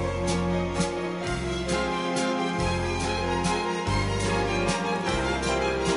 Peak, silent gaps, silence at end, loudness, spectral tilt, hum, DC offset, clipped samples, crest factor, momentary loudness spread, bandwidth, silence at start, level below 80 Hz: -10 dBFS; none; 0 s; -27 LUFS; -5 dB/octave; none; under 0.1%; under 0.1%; 16 dB; 3 LU; 11 kHz; 0 s; -38 dBFS